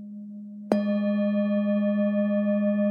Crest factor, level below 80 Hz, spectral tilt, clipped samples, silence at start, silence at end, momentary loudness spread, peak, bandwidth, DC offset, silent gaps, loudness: 20 dB; -78 dBFS; -9.5 dB/octave; under 0.1%; 0 s; 0 s; 16 LU; -6 dBFS; 5.2 kHz; under 0.1%; none; -25 LUFS